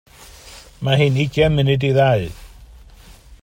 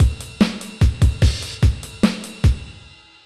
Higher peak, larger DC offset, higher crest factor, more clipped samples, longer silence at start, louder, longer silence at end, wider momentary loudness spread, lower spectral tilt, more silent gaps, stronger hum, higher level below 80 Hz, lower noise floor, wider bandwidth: about the same, -2 dBFS vs -4 dBFS; second, under 0.1% vs 0.1%; about the same, 16 dB vs 14 dB; neither; first, 0.45 s vs 0 s; first, -17 LUFS vs -20 LUFS; second, 0.05 s vs 0.55 s; first, 17 LU vs 3 LU; about the same, -7 dB/octave vs -6 dB/octave; neither; neither; second, -40 dBFS vs -22 dBFS; about the same, -43 dBFS vs -45 dBFS; first, 15.5 kHz vs 13 kHz